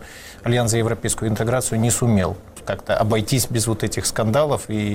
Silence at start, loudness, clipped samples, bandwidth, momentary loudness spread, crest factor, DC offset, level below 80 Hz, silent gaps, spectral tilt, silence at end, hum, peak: 0 s; -20 LUFS; under 0.1%; 17 kHz; 9 LU; 14 dB; under 0.1%; -42 dBFS; none; -5 dB/octave; 0 s; none; -8 dBFS